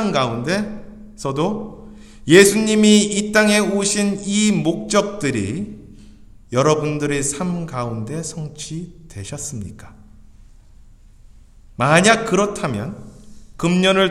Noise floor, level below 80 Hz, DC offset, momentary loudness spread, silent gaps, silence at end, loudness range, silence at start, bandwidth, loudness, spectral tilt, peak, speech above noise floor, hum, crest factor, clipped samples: -45 dBFS; -46 dBFS; under 0.1%; 19 LU; none; 0 s; 14 LU; 0 s; 14.5 kHz; -18 LUFS; -4 dB/octave; 0 dBFS; 27 dB; none; 20 dB; under 0.1%